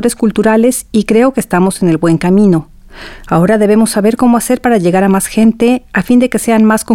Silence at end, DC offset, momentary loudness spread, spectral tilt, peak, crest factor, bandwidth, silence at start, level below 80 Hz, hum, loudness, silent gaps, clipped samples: 0 s; 0.6%; 3 LU; -6 dB/octave; 0 dBFS; 10 dB; 16.5 kHz; 0 s; -38 dBFS; none; -10 LUFS; none; under 0.1%